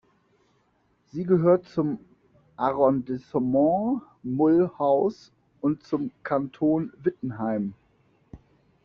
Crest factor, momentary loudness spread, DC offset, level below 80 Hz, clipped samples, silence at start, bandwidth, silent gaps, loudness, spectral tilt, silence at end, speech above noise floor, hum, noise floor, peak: 18 dB; 10 LU; under 0.1%; -62 dBFS; under 0.1%; 1.15 s; 6.6 kHz; none; -25 LUFS; -8.5 dB/octave; 0.5 s; 43 dB; none; -67 dBFS; -8 dBFS